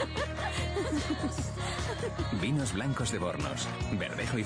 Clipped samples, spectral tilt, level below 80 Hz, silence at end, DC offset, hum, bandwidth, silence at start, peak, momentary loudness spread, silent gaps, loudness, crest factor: under 0.1%; -5 dB/octave; -44 dBFS; 0 s; under 0.1%; none; 10.5 kHz; 0 s; -20 dBFS; 4 LU; none; -33 LUFS; 12 dB